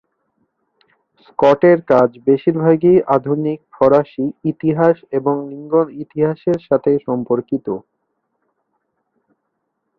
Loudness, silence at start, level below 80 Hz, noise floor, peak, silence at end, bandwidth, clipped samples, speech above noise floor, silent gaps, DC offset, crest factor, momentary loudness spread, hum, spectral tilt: -16 LUFS; 1.4 s; -58 dBFS; -73 dBFS; -2 dBFS; 2.2 s; 6.6 kHz; under 0.1%; 57 dB; none; under 0.1%; 16 dB; 11 LU; none; -9.5 dB/octave